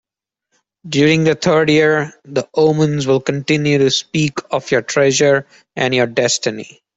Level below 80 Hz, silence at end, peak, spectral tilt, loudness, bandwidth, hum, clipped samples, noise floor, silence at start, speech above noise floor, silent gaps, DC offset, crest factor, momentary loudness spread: -54 dBFS; 0.3 s; -2 dBFS; -4.5 dB/octave; -15 LUFS; 8.2 kHz; none; under 0.1%; -78 dBFS; 0.85 s; 63 dB; none; under 0.1%; 14 dB; 9 LU